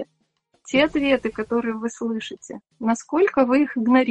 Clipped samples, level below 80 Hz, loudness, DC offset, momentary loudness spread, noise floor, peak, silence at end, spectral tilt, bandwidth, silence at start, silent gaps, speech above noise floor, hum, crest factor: under 0.1%; -56 dBFS; -22 LUFS; under 0.1%; 14 LU; -67 dBFS; -4 dBFS; 0 s; -4.5 dB/octave; 8.8 kHz; 0 s; none; 46 dB; none; 18 dB